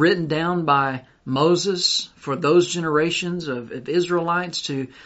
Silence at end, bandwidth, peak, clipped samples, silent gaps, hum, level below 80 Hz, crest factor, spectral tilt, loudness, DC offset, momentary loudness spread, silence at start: 0.05 s; 8.2 kHz; -6 dBFS; under 0.1%; none; none; -58 dBFS; 16 dB; -4.5 dB/octave; -21 LUFS; under 0.1%; 10 LU; 0 s